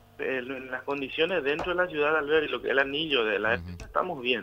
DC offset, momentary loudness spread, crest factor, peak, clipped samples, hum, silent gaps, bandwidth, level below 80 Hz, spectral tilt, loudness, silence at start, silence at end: under 0.1%; 7 LU; 18 dB; -10 dBFS; under 0.1%; none; none; 15.5 kHz; -54 dBFS; -5.5 dB/octave; -27 LUFS; 0.2 s; 0 s